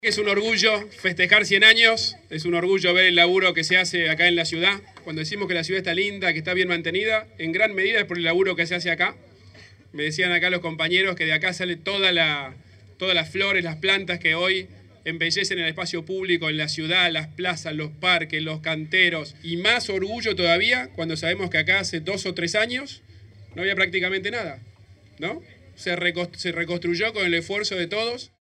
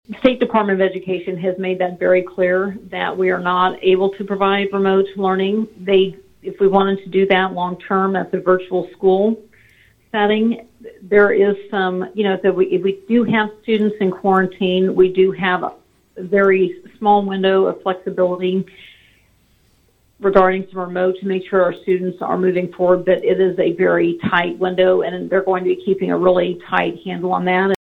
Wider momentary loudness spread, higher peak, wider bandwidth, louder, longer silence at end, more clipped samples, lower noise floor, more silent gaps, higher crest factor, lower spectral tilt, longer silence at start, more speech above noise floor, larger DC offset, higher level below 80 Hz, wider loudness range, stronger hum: first, 12 LU vs 7 LU; about the same, 0 dBFS vs 0 dBFS; first, 12 kHz vs 4.3 kHz; second, -21 LUFS vs -17 LUFS; first, 0.25 s vs 0.05 s; neither; second, -48 dBFS vs -57 dBFS; neither; first, 24 dB vs 18 dB; second, -3.5 dB/octave vs -8 dB/octave; about the same, 0.05 s vs 0.1 s; second, 26 dB vs 41 dB; neither; second, -62 dBFS vs -54 dBFS; first, 8 LU vs 3 LU; neither